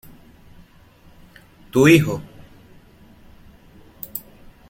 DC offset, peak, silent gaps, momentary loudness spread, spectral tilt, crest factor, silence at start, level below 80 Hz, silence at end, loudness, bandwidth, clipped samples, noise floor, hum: under 0.1%; 0 dBFS; none; 20 LU; -6 dB/octave; 22 dB; 1.75 s; -50 dBFS; 0.5 s; -18 LUFS; 16.5 kHz; under 0.1%; -50 dBFS; none